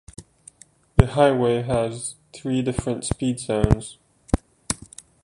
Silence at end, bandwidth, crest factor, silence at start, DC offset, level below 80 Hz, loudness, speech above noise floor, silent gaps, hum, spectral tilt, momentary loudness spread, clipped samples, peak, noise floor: 0.5 s; 11.5 kHz; 22 dB; 0.2 s; under 0.1%; -34 dBFS; -23 LUFS; 30 dB; none; none; -6 dB/octave; 15 LU; under 0.1%; -2 dBFS; -52 dBFS